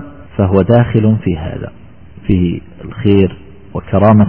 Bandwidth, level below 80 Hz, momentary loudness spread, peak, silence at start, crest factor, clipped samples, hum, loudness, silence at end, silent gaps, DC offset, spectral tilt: 3.3 kHz; -34 dBFS; 16 LU; 0 dBFS; 0 s; 12 dB; under 0.1%; none; -13 LUFS; 0 s; none; 1%; -12 dB/octave